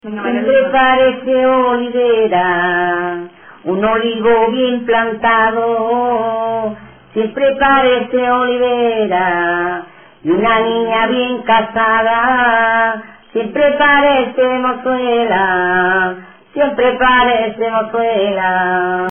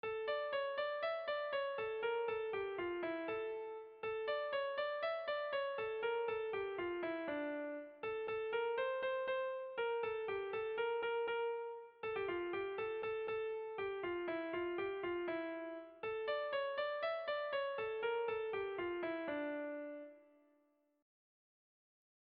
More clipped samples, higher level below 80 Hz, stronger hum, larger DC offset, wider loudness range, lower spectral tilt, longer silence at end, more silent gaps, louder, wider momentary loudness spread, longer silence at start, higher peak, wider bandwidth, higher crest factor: neither; first, -46 dBFS vs -76 dBFS; neither; neither; about the same, 2 LU vs 2 LU; first, -9 dB/octave vs -1.5 dB/octave; second, 0 s vs 2.15 s; neither; first, -13 LUFS vs -41 LUFS; first, 9 LU vs 6 LU; about the same, 0.05 s vs 0.05 s; first, -2 dBFS vs -30 dBFS; second, 3.5 kHz vs 5 kHz; about the same, 12 dB vs 12 dB